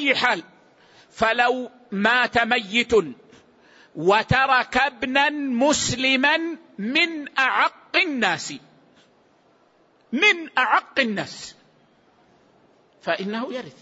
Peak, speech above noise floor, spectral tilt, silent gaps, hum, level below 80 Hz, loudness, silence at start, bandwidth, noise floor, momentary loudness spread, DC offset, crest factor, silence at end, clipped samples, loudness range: -6 dBFS; 38 dB; -3 dB/octave; none; none; -54 dBFS; -21 LUFS; 0 s; 8 kHz; -59 dBFS; 14 LU; under 0.1%; 18 dB; 0.1 s; under 0.1%; 3 LU